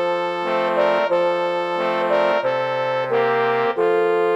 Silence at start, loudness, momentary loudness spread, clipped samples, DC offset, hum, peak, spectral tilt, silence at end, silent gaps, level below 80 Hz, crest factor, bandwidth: 0 s; -19 LUFS; 4 LU; under 0.1%; under 0.1%; none; -4 dBFS; -5.5 dB/octave; 0 s; none; -70 dBFS; 14 dB; 10 kHz